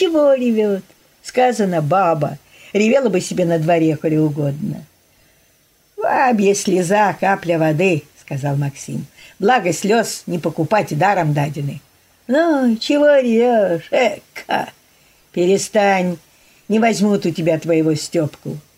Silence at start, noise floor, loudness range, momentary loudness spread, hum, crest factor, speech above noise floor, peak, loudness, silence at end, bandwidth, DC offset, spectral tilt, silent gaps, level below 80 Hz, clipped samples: 0 s; -56 dBFS; 2 LU; 12 LU; none; 14 dB; 40 dB; -2 dBFS; -17 LUFS; 0.15 s; 16 kHz; under 0.1%; -5.5 dB/octave; none; -60 dBFS; under 0.1%